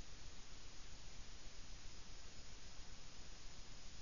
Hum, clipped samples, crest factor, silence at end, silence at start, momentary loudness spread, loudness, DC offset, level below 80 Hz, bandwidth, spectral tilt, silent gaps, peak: none; under 0.1%; 12 dB; 0 s; 0 s; 0 LU; -58 LUFS; 0.3%; -58 dBFS; 7.2 kHz; -2.5 dB/octave; none; -38 dBFS